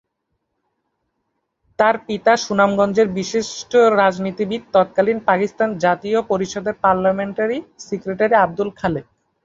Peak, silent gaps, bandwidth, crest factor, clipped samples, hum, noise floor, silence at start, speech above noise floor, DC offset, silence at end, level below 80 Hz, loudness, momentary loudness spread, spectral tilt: -2 dBFS; none; 7.8 kHz; 18 dB; under 0.1%; none; -74 dBFS; 1.8 s; 56 dB; under 0.1%; 0.45 s; -54 dBFS; -18 LUFS; 8 LU; -5 dB/octave